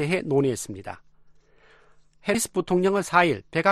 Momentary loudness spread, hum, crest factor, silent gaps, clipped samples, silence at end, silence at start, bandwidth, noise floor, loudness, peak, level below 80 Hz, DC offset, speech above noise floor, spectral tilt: 16 LU; none; 22 dB; none; under 0.1%; 0 s; 0 s; 13 kHz; -56 dBFS; -24 LUFS; -4 dBFS; -58 dBFS; under 0.1%; 32 dB; -5 dB/octave